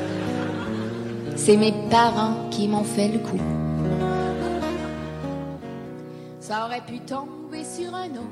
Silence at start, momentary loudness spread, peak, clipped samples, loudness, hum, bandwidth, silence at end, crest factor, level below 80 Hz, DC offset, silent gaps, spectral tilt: 0 s; 16 LU; -6 dBFS; under 0.1%; -25 LUFS; none; 13 kHz; 0 s; 20 dB; -50 dBFS; under 0.1%; none; -5.5 dB/octave